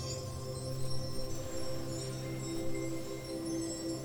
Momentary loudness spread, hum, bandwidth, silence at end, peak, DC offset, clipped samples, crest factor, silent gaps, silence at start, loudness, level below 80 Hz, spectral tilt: 3 LU; none; 19 kHz; 0 s; -22 dBFS; under 0.1%; under 0.1%; 14 dB; none; 0 s; -39 LUFS; -50 dBFS; -5 dB/octave